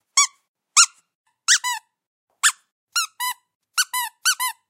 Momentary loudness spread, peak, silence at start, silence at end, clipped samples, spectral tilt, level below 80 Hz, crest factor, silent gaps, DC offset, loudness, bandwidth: 12 LU; 0 dBFS; 0.15 s; 0.2 s; under 0.1%; 8.5 dB/octave; -80 dBFS; 24 dB; 0.48-0.54 s, 1.15-1.25 s, 2.07-2.27 s, 2.72-2.87 s, 3.55-3.60 s; under 0.1%; -20 LUFS; 16.5 kHz